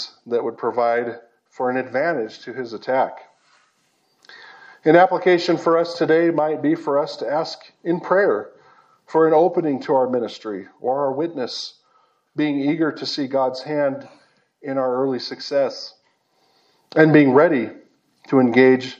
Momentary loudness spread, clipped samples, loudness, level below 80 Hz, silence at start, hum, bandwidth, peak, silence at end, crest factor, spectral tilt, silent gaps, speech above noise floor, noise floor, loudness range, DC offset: 16 LU; under 0.1%; -20 LUFS; -78 dBFS; 0 s; none; 8 kHz; 0 dBFS; 0.05 s; 20 dB; -6.5 dB/octave; none; 46 dB; -65 dBFS; 7 LU; under 0.1%